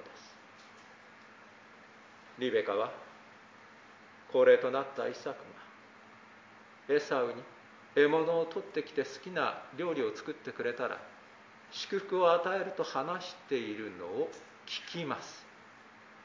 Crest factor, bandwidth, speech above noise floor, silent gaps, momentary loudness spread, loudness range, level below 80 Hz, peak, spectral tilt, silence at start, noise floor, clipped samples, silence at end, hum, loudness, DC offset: 22 dB; 7.6 kHz; 24 dB; none; 27 LU; 7 LU; -84 dBFS; -12 dBFS; -4.5 dB/octave; 0 s; -56 dBFS; under 0.1%; 0 s; none; -33 LUFS; under 0.1%